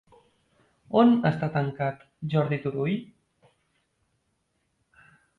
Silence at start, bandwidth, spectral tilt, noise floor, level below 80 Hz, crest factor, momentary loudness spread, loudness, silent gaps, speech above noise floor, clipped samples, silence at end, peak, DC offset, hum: 0.9 s; 4.5 kHz; -9.5 dB/octave; -74 dBFS; -64 dBFS; 20 dB; 11 LU; -25 LUFS; none; 50 dB; under 0.1%; 2.35 s; -8 dBFS; under 0.1%; none